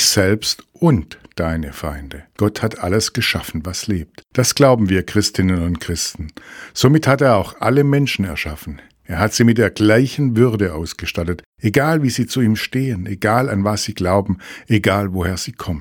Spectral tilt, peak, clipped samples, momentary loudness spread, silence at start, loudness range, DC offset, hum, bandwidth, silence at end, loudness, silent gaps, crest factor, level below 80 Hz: -5 dB/octave; 0 dBFS; under 0.1%; 13 LU; 0 s; 3 LU; under 0.1%; none; 19 kHz; 0 s; -17 LUFS; 11.46-11.53 s; 18 dB; -38 dBFS